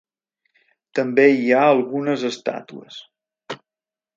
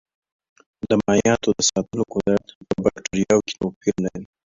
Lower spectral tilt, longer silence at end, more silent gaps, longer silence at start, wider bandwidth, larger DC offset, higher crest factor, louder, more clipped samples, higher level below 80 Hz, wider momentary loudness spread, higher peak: about the same, -5.5 dB/octave vs -4.5 dB/octave; first, 0.6 s vs 0.25 s; second, none vs 2.55-2.61 s, 3.76-3.81 s; about the same, 0.95 s vs 0.85 s; about the same, 7.6 kHz vs 7.8 kHz; neither; about the same, 20 dB vs 18 dB; first, -18 LUFS vs -21 LUFS; neither; second, -76 dBFS vs -50 dBFS; first, 22 LU vs 9 LU; about the same, -2 dBFS vs -4 dBFS